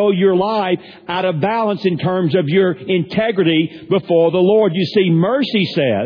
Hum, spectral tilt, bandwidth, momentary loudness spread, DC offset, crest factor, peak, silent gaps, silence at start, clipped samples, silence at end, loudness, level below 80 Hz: none; -8.5 dB/octave; 5.4 kHz; 6 LU; under 0.1%; 12 dB; -2 dBFS; none; 0 s; under 0.1%; 0 s; -16 LUFS; -56 dBFS